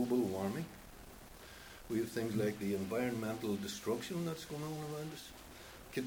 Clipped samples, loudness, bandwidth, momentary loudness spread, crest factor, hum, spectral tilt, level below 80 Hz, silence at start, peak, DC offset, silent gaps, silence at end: under 0.1%; -39 LUFS; over 20 kHz; 16 LU; 16 dB; none; -5.5 dB/octave; -64 dBFS; 0 s; -22 dBFS; under 0.1%; none; 0 s